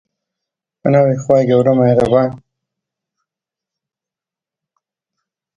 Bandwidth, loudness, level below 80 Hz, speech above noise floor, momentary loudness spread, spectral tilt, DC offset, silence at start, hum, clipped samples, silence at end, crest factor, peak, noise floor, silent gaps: 8.4 kHz; -13 LUFS; -50 dBFS; 76 dB; 5 LU; -8.5 dB/octave; under 0.1%; 0.85 s; none; under 0.1%; 3.2 s; 18 dB; 0 dBFS; -88 dBFS; none